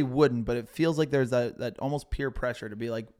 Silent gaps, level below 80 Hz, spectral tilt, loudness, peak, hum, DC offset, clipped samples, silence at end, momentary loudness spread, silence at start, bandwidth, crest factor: none; -44 dBFS; -7 dB/octave; -29 LUFS; -8 dBFS; none; under 0.1%; under 0.1%; 0.15 s; 9 LU; 0 s; 15.5 kHz; 20 dB